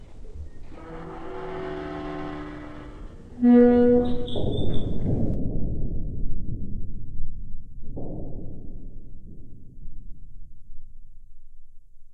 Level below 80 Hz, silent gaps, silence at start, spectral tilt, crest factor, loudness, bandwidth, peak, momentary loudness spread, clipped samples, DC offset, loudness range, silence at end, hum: -34 dBFS; none; 0 s; -9.5 dB/octave; 16 dB; -25 LUFS; 4.1 kHz; -6 dBFS; 27 LU; under 0.1%; under 0.1%; 20 LU; 0 s; none